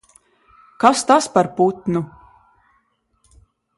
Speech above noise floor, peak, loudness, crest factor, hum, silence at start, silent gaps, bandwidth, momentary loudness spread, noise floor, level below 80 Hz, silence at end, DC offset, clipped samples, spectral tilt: 48 dB; 0 dBFS; -17 LUFS; 20 dB; none; 0.8 s; none; 11.5 kHz; 10 LU; -65 dBFS; -58 dBFS; 1.7 s; under 0.1%; under 0.1%; -4.5 dB/octave